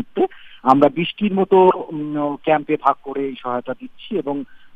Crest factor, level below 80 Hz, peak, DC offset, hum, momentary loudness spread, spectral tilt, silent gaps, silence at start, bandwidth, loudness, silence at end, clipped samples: 18 dB; -58 dBFS; 0 dBFS; under 0.1%; none; 13 LU; -8.5 dB/octave; none; 0 s; 5.6 kHz; -19 LUFS; 0.1 s; under 0.1%